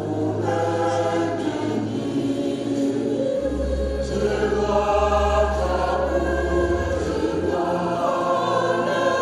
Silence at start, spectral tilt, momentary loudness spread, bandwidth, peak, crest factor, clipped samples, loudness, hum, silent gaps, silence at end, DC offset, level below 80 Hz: 0 s; -6.5 dB/octave; 5 LU; 12.5 kHz; -8 dBFS; 14 dB; under 0.1%; -22 LUFS; none; none; 0 s; under 0.1%; -32 dBFS